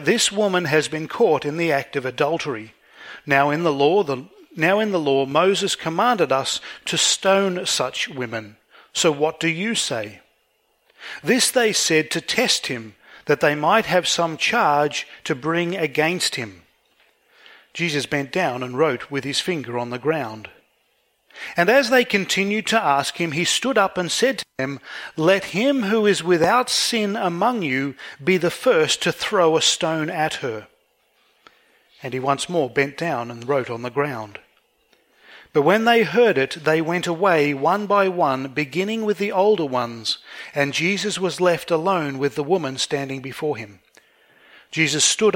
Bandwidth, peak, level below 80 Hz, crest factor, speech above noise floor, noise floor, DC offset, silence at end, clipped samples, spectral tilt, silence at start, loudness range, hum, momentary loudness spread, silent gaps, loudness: 16.5 kHz; -2 dBFS; -64 dBFS; 20 dB; 45 dB; -66 dBFS; under 0.1%; 0 s; under 0.1%; -3.5 dB/octave; 0 s; 5 LU; none; 11 LU; none; -20 LUFS